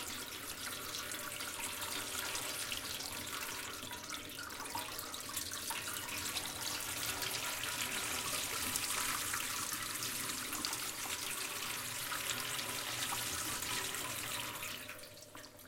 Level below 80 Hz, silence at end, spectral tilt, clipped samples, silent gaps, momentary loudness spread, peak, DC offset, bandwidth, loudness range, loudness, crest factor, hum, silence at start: -64 dBFS; 0 s; -0.5 dB/octave; under 0.1%; none; 7 LU; -16 dBFS; under 0.1%; 17 kHz; 4 LU; -38 LUFS; 24 dB; none; 0 s